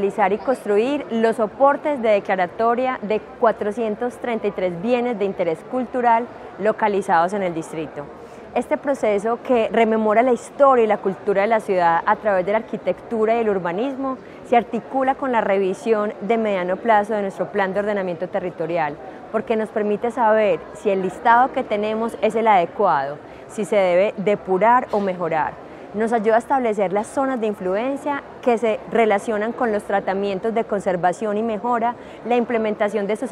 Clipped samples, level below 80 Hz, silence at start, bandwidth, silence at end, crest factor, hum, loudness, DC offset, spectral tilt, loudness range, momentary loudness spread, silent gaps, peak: under 0.1%; -58 dBFS; 0 s; 12 kHz; 0 s; 18 dB; none; -20 LUFS; under 0.1%; -6 dB/octave; 3 LU; 8 LU; none; -2 dBFS